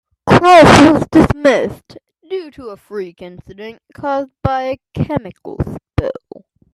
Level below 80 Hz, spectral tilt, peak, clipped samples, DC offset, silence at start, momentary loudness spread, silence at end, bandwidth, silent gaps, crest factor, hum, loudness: -36 dBFS; -6 dB/octave; 0 dBFS; under 0.1%; under 0.1%; 0.25 s; 25 LU; 0.6 s; 13 kHz; none; 14 dB; none; -12 LUFS